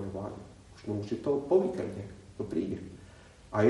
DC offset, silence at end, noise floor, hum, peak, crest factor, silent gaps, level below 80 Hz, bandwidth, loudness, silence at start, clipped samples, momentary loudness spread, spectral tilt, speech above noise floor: under 0.1%; 0 s; -53 dBFS; none; -12 dBFS; 20 dB; none; -60 dBFS; 11.5 kHz; -33 LUFS; 0 s; under 0.1%; 21 LU; -8 dB/octave; 21 dB